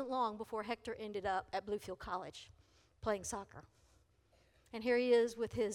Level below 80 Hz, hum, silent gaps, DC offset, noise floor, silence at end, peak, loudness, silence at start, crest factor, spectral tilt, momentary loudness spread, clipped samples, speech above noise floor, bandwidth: -66 dBFS; none; none; under 0.1%; -72 dBFS; 0 s; -20 dBFS; -39 LUFS; 0 s; 18 dB; -4 dB/octave; 18 LU; under 0.1%; 33 dB; 14.5 kHz